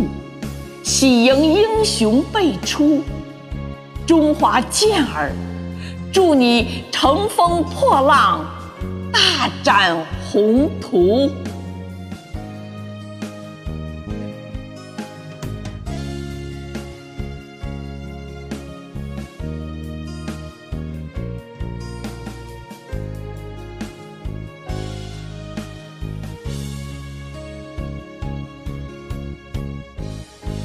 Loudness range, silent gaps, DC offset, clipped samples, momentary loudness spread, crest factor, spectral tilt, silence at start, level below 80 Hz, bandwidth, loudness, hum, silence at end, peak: 16 LU; none; under 0.1%; under 0.1%; 19 LU; 20 dB; -4.5 dB/octave; 0 s; -36 dBFS; 15.5 kHz; -18 LUFS; none; 0 s; 0 dBFS